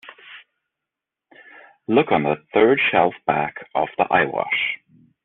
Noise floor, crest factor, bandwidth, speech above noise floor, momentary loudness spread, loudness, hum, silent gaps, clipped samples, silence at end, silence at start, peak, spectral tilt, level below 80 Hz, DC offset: -85 dBFS; 18 dB; 4.1 kHz; 66 dB; 9 LU; -20 LUFS; none; none; under 0.1%; 0.5 s; 0.05 s; -2 dBFS; -3 dB/octave; -60 dBFS; under 0.1%